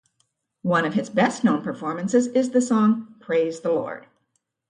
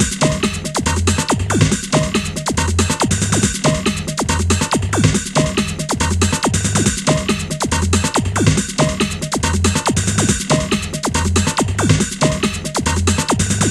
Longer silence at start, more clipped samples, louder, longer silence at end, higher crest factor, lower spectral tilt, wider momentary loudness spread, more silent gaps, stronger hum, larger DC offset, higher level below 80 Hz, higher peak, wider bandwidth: first, 0.65 s vs 0 s; neither; second, -22 LUFS vs -17 LUFS; first, 0.7 s vs 0 s; about the same, 16 dB vs 16 dB; first, -6 dB/octave vs -4 dB/octave; first, 8 LU vs 4 LU; neither; neither; neither; second, -70 dBFS vs -30 dBFS; second, -6 dBFS vs 0 dBFS; second, 10.5 kHz vs 13.5 kHz